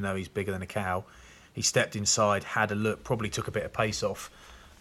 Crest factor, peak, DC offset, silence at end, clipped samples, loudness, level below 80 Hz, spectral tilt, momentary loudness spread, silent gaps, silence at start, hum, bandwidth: 18 dB; -12 dBFS; under 0.1%; 0.1 s; under 0.1%; -29 LUFS; -56 dBFS; -3.5 dB/octave; 9 LU; none; 0 s; none; 16 kHz